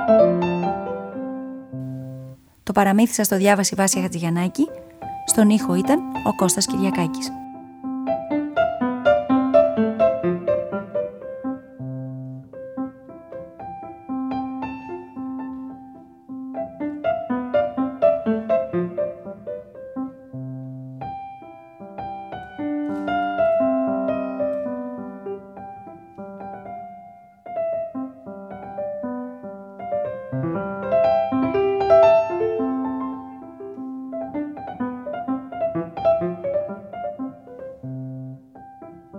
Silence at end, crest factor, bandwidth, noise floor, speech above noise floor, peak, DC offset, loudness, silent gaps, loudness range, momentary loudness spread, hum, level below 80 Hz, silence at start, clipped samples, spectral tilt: 0 s; 20 dB; 19 kHz; -45 dBFS; 26 dB; -2 dBFS; under 0.1%; -23 LUFS; none; 12 LU; 19 LU; none; -56 dBFS; 0 s; under 0.1%; -5 dB/octave